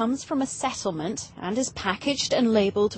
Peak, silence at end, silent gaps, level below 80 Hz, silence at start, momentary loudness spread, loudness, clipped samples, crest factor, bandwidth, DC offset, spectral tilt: -8 dBFS; 0 s; none; -56 dBFS; 0 s; 9 LU; -26 LUFS; under 0.1%; 16 dB; 8.8 kHz; under 0.1%; -4 dB/octave